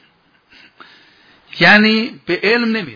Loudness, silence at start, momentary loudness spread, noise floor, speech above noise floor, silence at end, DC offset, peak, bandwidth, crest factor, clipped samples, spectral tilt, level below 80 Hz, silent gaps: -12 LUFS; 1.55 s; 11 LU; -55 dBFS; 42 dB; 0 s; under 0.1%; 0 dBFS; 5.4 kHz; 16 dB; under 0.1%; -6 dB/octave; -60 dBFS; none